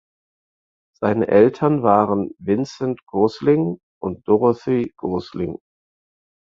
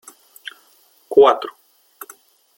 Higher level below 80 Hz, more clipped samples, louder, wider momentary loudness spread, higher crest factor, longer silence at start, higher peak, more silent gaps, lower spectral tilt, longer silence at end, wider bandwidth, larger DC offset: first, -54 dBFS vs -64 dBFS; neither; second, -20 LUFS vs -15 LUFS; second, 13 LU vs 26 LU; about the same, 20 dB vs 20 dB; about the same, 1 s vs 1.1 s; about the same, -2 dBFS vs 0 dBFS; first, 3.83-4.01 s vs none; first, -8.5 dB/octave vs -3.5 dB/octave; second, 0.9 s vs 1.05 s; second, 7.4 kHz vs 17 kHz; neither